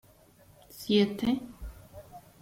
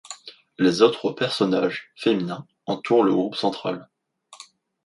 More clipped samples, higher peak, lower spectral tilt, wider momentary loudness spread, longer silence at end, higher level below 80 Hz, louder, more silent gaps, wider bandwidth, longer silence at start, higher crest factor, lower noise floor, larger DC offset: neither; second, -14 dBFS vs -4 dBFS; about the same, -6 dB/octave vs -5.5 dB/octave; first, 25 LU vs 16 LU; second, 0.2 s vs 0.5 s; first, -52 dBFS vs -68 dBFS; second, -28 LUFS vs -22 LUFS; neither; first, 16.5 kHz vs 11.5 kHz; first, 0.75 s vs 0.1 s; about the same, 20 dB vs 20 dB; first, -59 dBFS vs -49 dBFS; neither